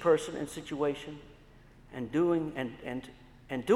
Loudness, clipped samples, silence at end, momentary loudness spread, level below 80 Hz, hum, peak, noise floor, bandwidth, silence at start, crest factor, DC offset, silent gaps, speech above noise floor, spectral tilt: -33 LUFS; under 0.1%; 0 s; 17 LU; -60 dBFS; none; -14 dBFS; -56 dBFS; 12.5 kHz; 0 s; 18 dB; under 0.1%; none; 25 dB; -6 dB/octave